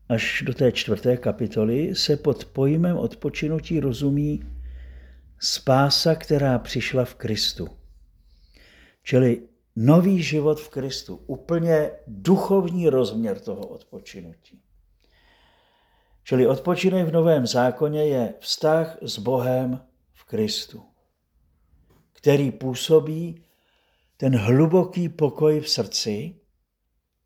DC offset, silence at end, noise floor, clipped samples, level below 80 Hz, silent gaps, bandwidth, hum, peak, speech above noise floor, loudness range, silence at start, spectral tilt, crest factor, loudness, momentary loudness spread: under 0.1%; 0.95 s; -74 dBFS; under 0.1%; -48 dBFS; none; 19 kHz; none; -4 dBFS; 53 dB; 5 LU; 0.1 s; -6 dB/octave; 20 dB; -22 LUFS; 15 LU